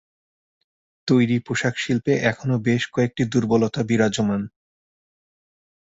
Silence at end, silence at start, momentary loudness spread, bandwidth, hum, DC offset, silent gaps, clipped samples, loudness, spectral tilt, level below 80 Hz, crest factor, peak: 1.45 s; 1.05 s; 4 LU; 8 kHz; none; under 0.1%; none; under 0.1%; -21 LUFS; -6 dB/octave; -56 dBFS; 20 dB; -4 dBFS